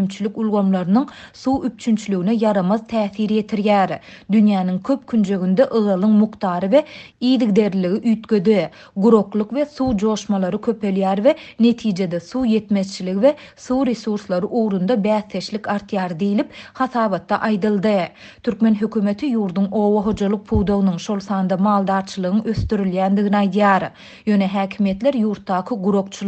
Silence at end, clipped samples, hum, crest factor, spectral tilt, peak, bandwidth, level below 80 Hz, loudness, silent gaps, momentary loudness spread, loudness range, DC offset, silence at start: 0 s; under 0.1%; none; 18 dB; -7 dB/octave; -2 dBFS; 8.4 kHz; -44 dBFS; -19 LUFS; none; 7 LU; 3 LU; under 0.1%; 0 s